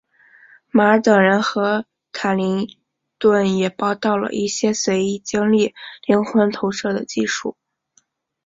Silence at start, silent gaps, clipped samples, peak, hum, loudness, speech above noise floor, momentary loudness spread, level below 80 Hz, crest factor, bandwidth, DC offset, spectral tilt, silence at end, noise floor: 0.75 s; none; under 0.1%; -2 dBFS; none; -19 LUFS; 44 dB; 10 LU; -60 dBFS; 18 dB; 7.8 kHz; under 0.1%; -5 dB/octave; 0.95 s; -62 dBFS